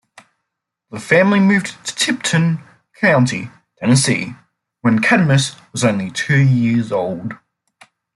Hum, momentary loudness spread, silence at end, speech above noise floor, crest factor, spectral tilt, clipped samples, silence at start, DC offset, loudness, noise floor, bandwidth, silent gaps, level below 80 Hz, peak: none; 14 LU; 0.8 s; 62 dB; 16 dB; -5 dB/octave; under 0.1%; 0.9 s; under 0.1%; -16 LUFS; -78 dBFS; 12 kHz; none; -56 dBFS; -2 dBFS